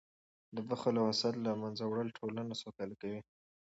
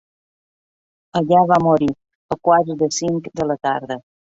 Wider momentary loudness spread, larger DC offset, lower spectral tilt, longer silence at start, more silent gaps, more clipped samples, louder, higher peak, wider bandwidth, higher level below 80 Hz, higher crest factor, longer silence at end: about the same, 13 LU vs 14 LU; neither; about the same, -5 dB/octave vs -5.5 dB/octave; second, 0.5 s vs 1.15 s; second, none vs 2.15-2.29 s; neither; second, -38 LUFS vs -18 LUFS; second, -20 dBFS vs -2 dBFS; about the same, 8 kHz vs 8 kHz; second, -78 dBFS vs -54 dBFS; about the same, 18 dB vs 18 dB; about the same, 0.4 s vs 0.35 s